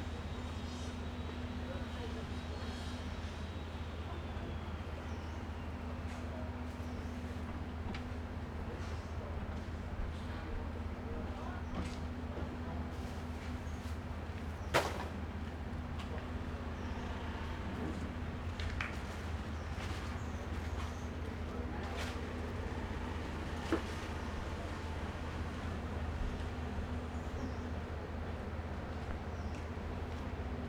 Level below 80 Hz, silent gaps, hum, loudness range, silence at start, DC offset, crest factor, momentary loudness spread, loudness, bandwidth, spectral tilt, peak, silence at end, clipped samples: -46 dBFS; none; none; 3 LU; 0 s; under 0.1%; 24 dB; 3 LU; -42 LUFS; 14.5 kHz; -6 dB/octave; -16 dBFS; 0 s; under 0.1%